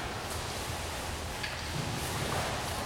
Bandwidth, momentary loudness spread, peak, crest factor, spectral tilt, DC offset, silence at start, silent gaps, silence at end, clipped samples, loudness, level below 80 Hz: 17 kHz; 4 LU; -20 dBFS; 14 dB; -3.5 dB/octave; under 0.1%; 0 s; none; 0 s; under 0.1%; -35 LUFS; -46 dBFS